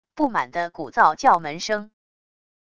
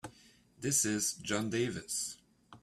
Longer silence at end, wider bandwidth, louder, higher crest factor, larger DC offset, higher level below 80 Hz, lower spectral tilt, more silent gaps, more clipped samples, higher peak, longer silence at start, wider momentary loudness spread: first, 0.75 s vs 0.05 s; second, 11 kHz vs 15.5 kHz; first, -21 LUFS vs -33 LUFS; about the same, 20 dB vs 20 dB; neither; first, -60 dBFS vs -68 dBFS; about the same, -4 dB/octave vs -3 dB/octave; neither; neither; first, -2 dBFS vs -16 dBFS; about the same, 0.15 s vs 0.05 s; about the same, 11 LU vs 12 LU